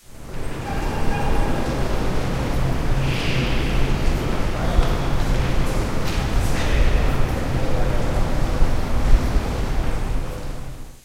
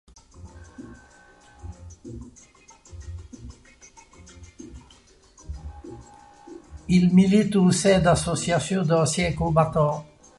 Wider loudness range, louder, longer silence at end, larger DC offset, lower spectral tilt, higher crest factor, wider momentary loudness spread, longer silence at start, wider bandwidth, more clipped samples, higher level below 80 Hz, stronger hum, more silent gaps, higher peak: second, 1 LU vs 24 LU; second, -24 LUFS vs -21 LUFS; second, 0.1 s vs 0.35 s; neither; about the same, -6 dB/octave vs -6 dB/octave; about the same, 16 dB vs 18 dB; second, 7 LU vs 26 LU; second, 0.1 s vs 0.4 s; first, 15 kHz vs 11.5 kHz; neither; first, -22 dBFS vs -44 dBFS; neither; neither; first, -2 dBFS vs -6 dBFS